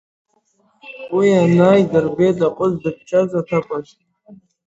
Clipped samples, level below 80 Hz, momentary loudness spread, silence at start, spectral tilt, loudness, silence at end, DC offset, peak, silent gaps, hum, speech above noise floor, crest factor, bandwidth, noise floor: under 0.1%; -56 dBFS; 15 LU; 0.85 s; -8 dB/octave; -16 LUFS; 0.3 s; under 0.1%; 0 dBFS; none; none; 46 dB; 18 dB; 8 kHz; -61 dBFS